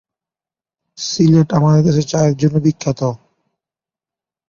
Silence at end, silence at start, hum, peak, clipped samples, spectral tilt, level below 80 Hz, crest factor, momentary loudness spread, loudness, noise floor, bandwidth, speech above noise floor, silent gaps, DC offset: 1.35 s; 1 s; none; -2 dBFS; under 0.1%; -7 dB/octave; -50 dBFS; 14 dB; 10 LU; -15 LUFS; under -90 dBFS; 7.2 kHz; over 77 dB; none; under 0.1%